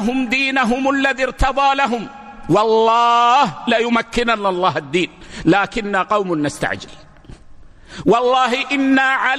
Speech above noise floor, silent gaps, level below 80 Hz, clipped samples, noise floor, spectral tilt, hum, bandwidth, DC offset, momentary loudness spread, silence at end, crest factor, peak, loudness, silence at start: 23 dB; none; -36 dBFS; under 0.1%; -40 dBFS; -4.5 dB/octave; none; 12.5 kHz; under 0.1%; 8 LU; 0 s; 14 dB; -2 dBFS; -16 LUFS; 0 s